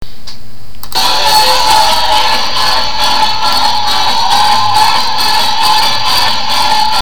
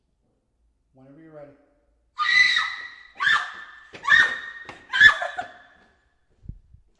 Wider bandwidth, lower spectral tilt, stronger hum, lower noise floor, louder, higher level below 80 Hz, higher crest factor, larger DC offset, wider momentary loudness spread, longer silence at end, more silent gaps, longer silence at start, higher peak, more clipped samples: first, over 20 kHz vs 11 kHz; about the same, -0.5 dB/octave vs -0.5 dB/octave; neither; second, -34 dBFS vs -70 dBFS; first, -9 LUFS vs -19 LUFS; first, -34 dBFS vs -56 dBFS; second, 12 dB vs 24 dB; first, 20% vs under 0.1%; second, 4 LU vs 25 LU; second, 0 s vs 0.45 s; neither; second, 0 s vs 1.35 s; about the same, 0 dBFS vs -2 dBFS; first, 0.2% vs under 0.1%